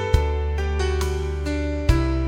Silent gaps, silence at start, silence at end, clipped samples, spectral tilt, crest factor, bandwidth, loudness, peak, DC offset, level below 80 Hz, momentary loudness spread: none; 0 s; 0 s; under 0.1%; -6.5 dB/octave; 18 dB; 12.5 kHz; -24 LUFS; -4 dBFS; under 0.1%; -24 dBFS; 4 LU